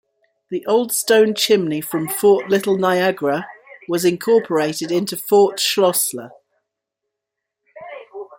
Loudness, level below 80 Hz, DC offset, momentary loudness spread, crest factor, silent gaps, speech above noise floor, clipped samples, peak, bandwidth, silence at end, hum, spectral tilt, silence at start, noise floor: -17 LUFS; -66 dBFS; under 0.1%; 17 LU; 16 dB; none; 64 dB; under 0.1%; -2 dBFS; 17 kHz; 0.1 s; none; -3.5 dB/octave; 0.5 s; -81 dBFS